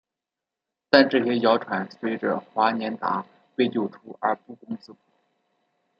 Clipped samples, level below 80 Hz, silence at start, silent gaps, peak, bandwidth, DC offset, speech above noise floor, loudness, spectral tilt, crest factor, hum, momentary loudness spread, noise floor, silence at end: under 0.1%; -72 dBFS; 0.95 s; none; 0 dBFS; 6.6 kHz; under 0.1%; 64 dB; -24 LUFS; -7 dB/octave; 24 dB; none; 17 LU; -87 dBFS; 1.1 s